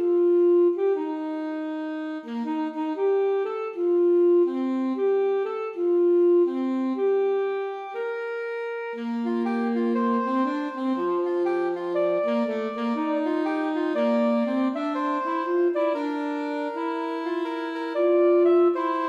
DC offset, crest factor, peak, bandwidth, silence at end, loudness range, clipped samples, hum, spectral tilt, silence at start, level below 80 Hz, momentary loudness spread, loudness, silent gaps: under 0.1%; 12 dB; -12 dBFS; 5.4 kHz; 0 s; 4 LU; under 0.1%; none; -7 dB/octave; 0 s; -84 dBFS; 11 LU; -24 LUFS; none